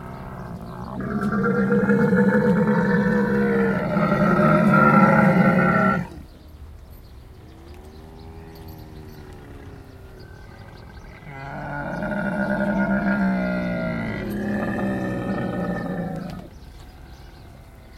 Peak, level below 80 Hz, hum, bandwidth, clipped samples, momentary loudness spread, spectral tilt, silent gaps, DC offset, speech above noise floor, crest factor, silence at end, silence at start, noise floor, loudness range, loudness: -4 dBFS; -44 dBFS; none; 13.5 kHz; under 0.1%; 26 LU; -8.5 dB/octave; none; under 0.1%; 23 dB; 20 dB; 0 s; 0 s; -43 dBFS; 24 LU; -21 LUFS